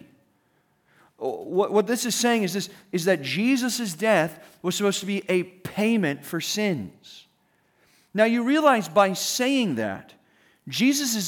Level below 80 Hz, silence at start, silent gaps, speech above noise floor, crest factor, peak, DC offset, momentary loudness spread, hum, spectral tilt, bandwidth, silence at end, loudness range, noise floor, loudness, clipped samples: -74 dBFS; 1.2 s; none; 43 dB; 18 dB; -6 dBFS; under 0.1%; 12 LU; none; -4 dB/octave; over 20 kHz; 0 s; 3 LU; -67 dBFS; -24 LUFS; under 0.1%